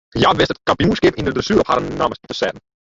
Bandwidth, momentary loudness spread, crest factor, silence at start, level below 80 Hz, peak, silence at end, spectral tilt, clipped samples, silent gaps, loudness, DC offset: 7.8 kHz; 8 LU; 18 dB; 0.15 s; -40 dBFS; 0 dBFS; 0.3 s; -5.5 dB/octave; under 0.1%; none; -17 LUFS; under 0.1%